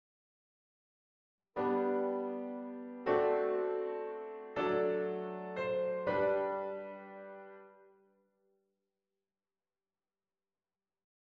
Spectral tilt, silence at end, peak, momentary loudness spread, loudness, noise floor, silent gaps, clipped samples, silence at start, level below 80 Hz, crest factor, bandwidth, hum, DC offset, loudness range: -8 dB/octave; 3.6 s; -20 dBFS; 15 LU; -36 LUFS; under -90 dBFS; none; under 0.1%; 1.55 s; -76 dBFS; 18 dB; 5.8 kHz; none; under 0.1%; 8 LU